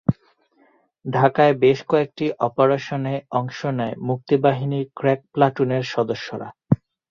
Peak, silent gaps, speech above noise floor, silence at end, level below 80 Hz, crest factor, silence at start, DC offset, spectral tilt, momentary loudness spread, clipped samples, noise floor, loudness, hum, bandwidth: -2 dBFS; none; 39 dB; 0.35 s; -56 dBFS; 18 dB; 0.1 s; under 0.1%; -7.5 dB/octave; 10 LU; under 0.1%; -60 dBFS; -21 LUFS; none; 7.2 kHz